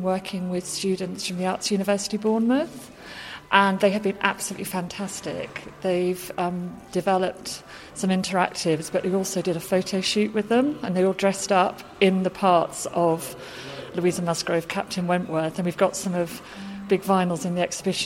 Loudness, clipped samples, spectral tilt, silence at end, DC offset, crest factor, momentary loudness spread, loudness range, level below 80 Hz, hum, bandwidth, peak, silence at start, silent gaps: -24 LUFS; under 0.1%; -4.5 dB/octave; 0 s; under 0.1%; 22 dB; 12 LU; 4 LU; -60 dBFS; none; 16.5 kHz; -2 dBFS; 0 s; none